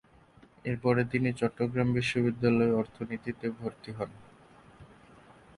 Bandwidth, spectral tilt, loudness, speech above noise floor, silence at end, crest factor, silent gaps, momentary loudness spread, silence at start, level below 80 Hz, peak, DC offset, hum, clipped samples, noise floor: 11.5 kHz; -7.5 dB/octave; -30 LUFS; 29 dB; 0.75 s; 18 dB; none; 13 LU; 0.65 s; -60 dBFS; -12 dBFS; under 0.1%; none; under 0.1%; -59 dBFS